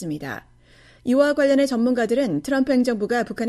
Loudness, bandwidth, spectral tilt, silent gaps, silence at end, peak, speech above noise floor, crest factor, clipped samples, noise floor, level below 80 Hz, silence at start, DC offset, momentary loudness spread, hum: -20 LUFS; 13.5 kHz; -5.5 dB/octave; none; 0 s; -4 dBFS; 31 dB; 16 dB; under 0.1%; -52 dBFS; -56 dBFS; 0 s; under 0.1%; 13 LU; none